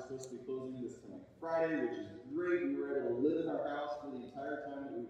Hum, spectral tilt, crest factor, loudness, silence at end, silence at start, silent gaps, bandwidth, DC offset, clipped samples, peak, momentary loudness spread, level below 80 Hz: none; -6.5 dB/octave; 16 dB; -39 LUFS; 0 s; 0 s; none; 9.2 kHz; under 0.1%; under 0.1%; -22 dBFS; 12 LU; -76 dBFS